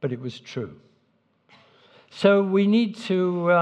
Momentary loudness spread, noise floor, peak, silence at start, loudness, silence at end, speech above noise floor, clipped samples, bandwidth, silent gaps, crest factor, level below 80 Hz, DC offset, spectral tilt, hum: 15 LU; -67 dBFS; -4 dBFS; 0 s; -23 LUFS; 0 s; 45 dB; under 0.1%; 8.8 kHz; none; 20 dB; -76 dBFS; under 0.1%; -7.5 dB/octave; none